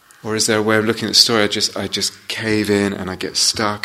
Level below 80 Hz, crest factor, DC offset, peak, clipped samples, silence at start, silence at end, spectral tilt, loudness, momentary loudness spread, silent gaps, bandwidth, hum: -54 dBFS; 18 dB; under 0.1%; 0 dBFS; under 0.1%; 0.25 s; 0 s; -2.5 dB/octave; -16 LUFS; 10 LU; none; 16 kHz; none